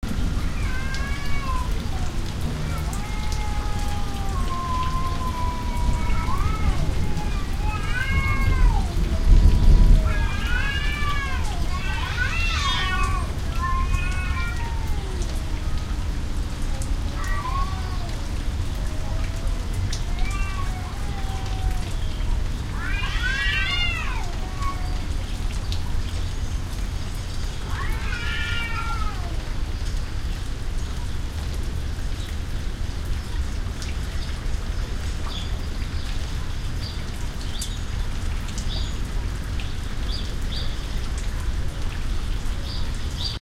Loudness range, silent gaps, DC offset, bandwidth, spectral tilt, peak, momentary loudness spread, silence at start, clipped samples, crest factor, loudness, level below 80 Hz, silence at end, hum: 8 LU; none; under 0.1%; 14.5 kHz; -4.5 dB/octave; -4 dBFS; 8 LU; 0 s; under 0.1%; 18 dB; -27 LUFS; -24 dBFS; 0.05 s; none